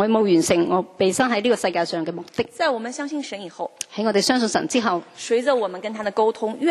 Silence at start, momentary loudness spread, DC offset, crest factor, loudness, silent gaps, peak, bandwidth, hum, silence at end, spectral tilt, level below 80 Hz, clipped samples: 0 s; 10 LU; under 0.1%; 18 dB; -22 LUFS; none; -4 dBFS; 13 kHz; none; 0 s; -4 dB/octave; -62 dBFS; under 0.1%